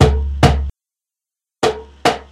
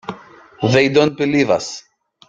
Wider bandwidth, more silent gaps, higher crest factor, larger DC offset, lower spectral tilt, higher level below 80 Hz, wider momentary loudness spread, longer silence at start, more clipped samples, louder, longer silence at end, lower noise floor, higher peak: first, 13 kHz vs 8.6 kHz; neither; about the same, 18 dB vs 16 dB; neither; about the same, -5.5 dB/octave vs -5.5 dB/octave; first, -22 dBFS vs -56 dBFS; second, 7 LU vs 18 LU; about the same, 0 s vs 0.1 s; first, 0.1% vs under 0.1%; about the same, -17 LUFS vs -16 LUFS; second, 0.1 s vs 0.5 s; first, -87 dBFS vs -38 dBFS; about the same, 0 dBFS vs -2 dBFS